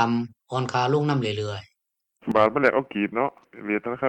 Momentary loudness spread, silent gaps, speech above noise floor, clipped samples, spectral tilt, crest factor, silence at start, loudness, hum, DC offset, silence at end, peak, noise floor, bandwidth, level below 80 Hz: 12 LU; none; 54 dB; under 0.1%; -6.5 dB/octave; 20 dB; 0 s; -24 LUFS; none; under 0.1%; 0 s; -6 dBFS; -77 dBFS; 9 kHz; -64 dBFS